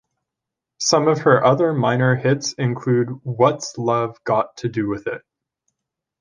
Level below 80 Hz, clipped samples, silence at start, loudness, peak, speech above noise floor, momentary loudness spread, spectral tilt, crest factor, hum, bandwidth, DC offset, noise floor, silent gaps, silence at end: -60 dBFS; under 0.1%; 0.8 s; -19 LUFS; -2 dBFS; 66 dB; 10 LU; -5.5 dB/octave; 18 dB; none; 10 kHz; under 0.1%; -84 dBFS; none; 1 s